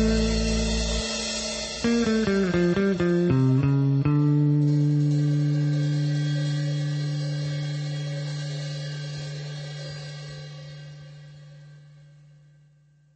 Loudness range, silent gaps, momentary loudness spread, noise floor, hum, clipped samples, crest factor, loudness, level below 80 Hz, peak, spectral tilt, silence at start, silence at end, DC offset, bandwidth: 16 LU; none; 16 LU; -59 dBFS; none; under 0.1%; 14 dB; -25 LUFS; -38 dBFS; -12 dBFS; -6 dB/octave; 0 s; 1.35 s; under 0.1%; 8.8 kHz